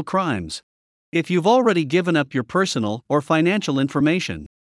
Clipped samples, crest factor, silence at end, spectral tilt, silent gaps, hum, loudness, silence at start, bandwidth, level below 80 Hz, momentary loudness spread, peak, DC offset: under 0.1%; 16 dB; 0.15 s; -5.5 dB/octave; 0.63-1.12 s; none; -20 LUFS; 0 s; 12 kHz; -56 dBFS; 9 LU; -4 dBFS; under 0.1%